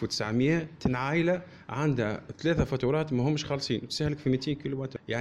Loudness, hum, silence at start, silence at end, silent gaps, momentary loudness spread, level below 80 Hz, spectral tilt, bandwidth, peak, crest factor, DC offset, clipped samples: -29 LUFS; none; 0 s; 0 s; none; 6 LU; -50 dBFS; -6 dB/octave; 12 kHz; -14 dBFS; 16 dB; under 0.1%; under 0.1%